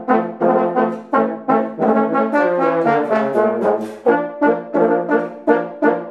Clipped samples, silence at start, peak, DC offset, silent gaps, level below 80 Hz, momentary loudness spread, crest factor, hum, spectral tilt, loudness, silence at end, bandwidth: under 0.1%; 0 s; 0 dBFS; under 0.1%; none; -62 dBFS; 3 LU; 16 dB; none; -8 dB/octave; -17 LUFS; 0 s; 9 kHz